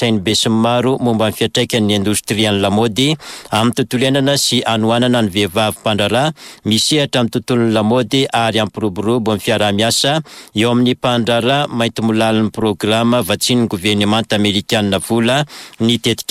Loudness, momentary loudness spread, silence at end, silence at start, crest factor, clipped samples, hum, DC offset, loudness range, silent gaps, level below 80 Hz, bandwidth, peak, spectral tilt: -15 LUFS; 4 LU; 0.1 s; 0 s; 10 dB; under 0.1%; none; under 0.1%; 1 LU; none; -50 dBFS; 16 kHz; -4 dBFS; -4.5 dB/octave